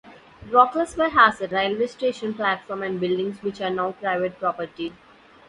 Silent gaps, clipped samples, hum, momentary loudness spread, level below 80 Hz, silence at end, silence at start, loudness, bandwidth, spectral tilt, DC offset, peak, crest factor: none; under 0.1%; none; 11 LU; -58 dBFS; 0.55 s; 0.05 s; -23 LUFS; 11.5 kHz; -5 dB/octave; under 0.1%; -2 dBFS; 22 dB